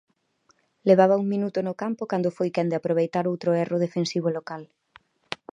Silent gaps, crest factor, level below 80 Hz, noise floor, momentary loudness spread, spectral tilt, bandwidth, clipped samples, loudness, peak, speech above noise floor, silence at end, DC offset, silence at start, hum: none; 20 dB; -74 dBFS; -66 dBFS; 14 LU; -7 dB/octave; 10 kHz; under 0.1%; -24 LUFS; -4 dBFS; 43 dB; 0.2 s; under 0.1%; 0.85 s; none